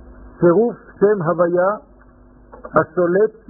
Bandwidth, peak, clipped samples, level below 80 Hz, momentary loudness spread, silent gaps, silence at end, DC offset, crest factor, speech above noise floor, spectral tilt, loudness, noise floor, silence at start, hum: 2.1 kHz; -2 dBFS; under 0.1%; -48 dBFS; 6 LU; none; 0.2 s; under 0.1%; 16 dB; 30 dB; -4 dB/octave; -17 LUFS; -47 dBFS; 0.2 s; none